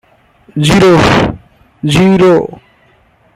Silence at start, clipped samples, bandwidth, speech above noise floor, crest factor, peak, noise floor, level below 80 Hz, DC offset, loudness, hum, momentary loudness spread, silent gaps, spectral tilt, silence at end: 0.55 s; under 0.1%; 14.5 kHz; 41 dB; 10 dB; 0 dBFS; -49 dBFS; -32 dBFS; under 0.1%; -9 LUFS; none; 14 LU; none; -6 dB/octave; 0.9 s